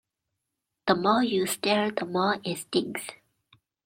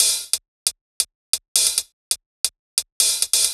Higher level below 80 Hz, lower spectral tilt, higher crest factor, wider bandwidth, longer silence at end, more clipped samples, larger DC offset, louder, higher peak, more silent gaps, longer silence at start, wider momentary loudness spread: second, -70 dBFS vs -62 dBFS; first, -4 dB/octave vs 4 dB/octave; about the same, 22 dB vs 22 dB; second, 16.5 kHz vs over 20 kHz; first, 0.7 s vs 0 s; neither; neither; second, -27 LUFS vs -20 LUFS; second, -6 dBFS vs 0 dBFS; second, none vs 0.48-0.66 s, 0.81-1.00 s, 1.15-1.33 s, 1.48-1.55 s, 1.93-2.11 s, 2.26-2.44 s, 2.59-2.77 s, 2.92-3.00 s; first, 0.85 s vs 0 s; first, 11 LU vs 8 LU